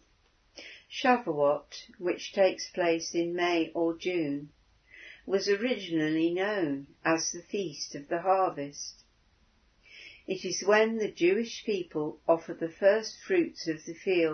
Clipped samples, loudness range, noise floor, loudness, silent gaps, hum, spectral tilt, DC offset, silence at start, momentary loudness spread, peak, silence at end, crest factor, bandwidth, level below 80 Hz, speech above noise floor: under 0.1%; 4 LU; -67 dBFS; -29 LUFS; none; none; -4 dB/octave; under 0.1%; 0.55 s; 14 LU; -10 dBFS; 0 s; 20 dB; 6.6 kHz; -70 dBFS; 38 dB